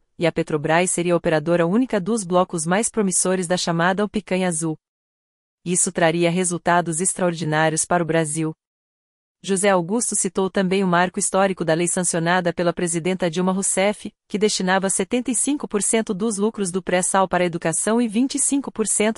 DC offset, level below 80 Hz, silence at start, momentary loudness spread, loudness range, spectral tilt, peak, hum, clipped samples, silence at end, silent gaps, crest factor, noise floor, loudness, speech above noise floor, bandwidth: under 0.1%; -56 dBFS; 0.2 s; 4 LU; 2 LU; -4 dB/octave; -4 dBFS; none; under 0.1%; 0.05 s; 4.88-5.58 s, 8.67-9.35 s; 16 dB; under -90 dBFS; -20 LUFS; over 70 dB; 11.5 kHz